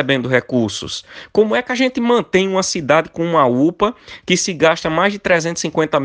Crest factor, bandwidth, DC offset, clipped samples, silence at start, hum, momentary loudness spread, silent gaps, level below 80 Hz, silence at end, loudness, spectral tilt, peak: 16 dB; 10.5 kHz; under 0.1%; under 0.1%; 0 s; none; 6 LU; none; -50 dBFS; 0 s; -16 LUFS; -4 dB/octave; 0 dBFS